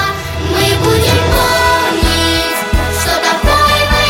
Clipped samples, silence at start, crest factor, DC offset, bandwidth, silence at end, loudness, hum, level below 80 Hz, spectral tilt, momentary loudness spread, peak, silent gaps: under 0.1%; 0 s; 12 dB; under 0.1%; 17 kHz; 0 s; -11 LUFS; none; -20 dBFS; -4 dB/octave; 5 LU; 0 dBFS; none